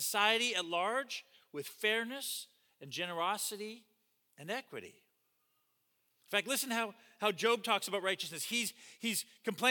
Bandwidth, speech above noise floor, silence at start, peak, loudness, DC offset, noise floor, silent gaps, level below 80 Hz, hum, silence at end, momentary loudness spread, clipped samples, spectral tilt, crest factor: 19 kHz; 42 dB; 0 s; -16 dBFS; -35 LUFS; under 0.1%; -78 dBFS; none; under -90 dBFS; none; 0 s; 14 LU; under 0.1%; -1.5 dB/octave; 22 dB